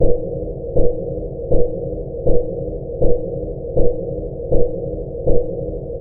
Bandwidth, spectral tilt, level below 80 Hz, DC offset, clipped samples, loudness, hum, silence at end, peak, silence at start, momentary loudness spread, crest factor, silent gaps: 0.9 kHz; -19.5 dB/octave; -24 dBFS; 0.8%; under 0.1%; -22 LUFS; none; 0 s; 0 dBFS; 0 s; 6 LU; 14 dB; none